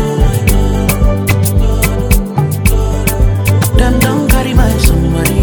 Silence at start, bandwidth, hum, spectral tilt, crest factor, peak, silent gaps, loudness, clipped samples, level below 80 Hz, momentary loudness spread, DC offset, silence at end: 0 s; over 20 kHz; none; -5.5 dB/octave; 10 dB; 0 dBFS; none; -12 LUFS; 0.3%; -14 dBFS; 2 LU; under 0.1%; 0 s